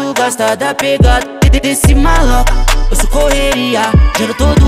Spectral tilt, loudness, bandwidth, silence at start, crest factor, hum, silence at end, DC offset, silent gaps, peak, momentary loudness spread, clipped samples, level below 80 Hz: -4.5 dB/octave; -11 LUFS; 15.5 kHz; 0 s; 8 dB; none; 0 s; under 0.1%; none; 0 dBFS; 4 LU; under 0.1%; -12 dBFS